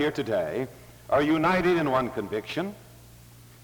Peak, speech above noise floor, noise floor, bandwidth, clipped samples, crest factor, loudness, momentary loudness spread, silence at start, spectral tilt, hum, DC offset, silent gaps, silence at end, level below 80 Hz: -12 dBFS; 24 dB; -50 dBFS; over 20 kHz; under 0.1%; 14 dB; -26 LUFS; 11 LU; 0 s; -6.5 dB/octave; none; under 0.1%; none; 0.55 s; -54 dBFS